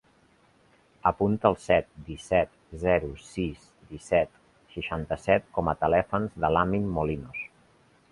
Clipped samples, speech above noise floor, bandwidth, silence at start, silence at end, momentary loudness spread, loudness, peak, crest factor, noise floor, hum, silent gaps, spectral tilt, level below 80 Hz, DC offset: under 0.1%; 36 dB; 11.5 kHz; 1.05 s; 0.65 s; 13 LU; -27 LUFS; -4 dBFS; 24 dB; -62 dBFS; none; none; -7 dB/octave; -46 dBFS; under 0.1%